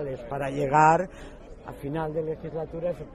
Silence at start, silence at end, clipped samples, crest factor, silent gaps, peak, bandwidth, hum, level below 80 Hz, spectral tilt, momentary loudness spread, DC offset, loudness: 0 s; 0 s; under 0.1%; 20 dB; none; -6 dBFS; 13 kHz; none; -48 dBFS; -7 dB/octave; 24 LU; under 0.1%; -26 LUFS